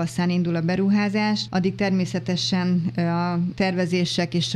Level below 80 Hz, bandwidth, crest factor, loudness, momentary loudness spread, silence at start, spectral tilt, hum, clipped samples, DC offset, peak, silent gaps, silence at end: -56 dBFS; 11.5 kHz; 12 dB; -23 LUFS; 3 LU; 0 s; -6 dB/octave; none; under 0.1%; under 0.1%; -10 dBFS; none; 0 s